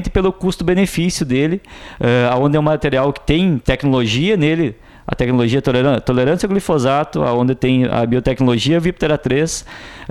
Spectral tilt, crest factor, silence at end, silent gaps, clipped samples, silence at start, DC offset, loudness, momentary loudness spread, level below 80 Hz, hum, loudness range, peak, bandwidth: -6 dB/octave; 16 dB; 0 s; none; under 0.1%; 0 s; under 0.1%; -16 LUFS; 6 LU; -34 dBFS; none; 1 LU; 0 dBFS; 14.5 kHz